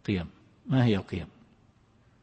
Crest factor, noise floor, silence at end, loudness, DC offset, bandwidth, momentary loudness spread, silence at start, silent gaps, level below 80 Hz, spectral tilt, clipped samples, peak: 18 dB; -62 dBFS; 0.95 s; -29 LUFS; under 0.1%; 8.2 kHz; 21 LU; 0.05 s; none; -54 dBFS; -8.5 dB/octave; under 0.1%; -12 dBFS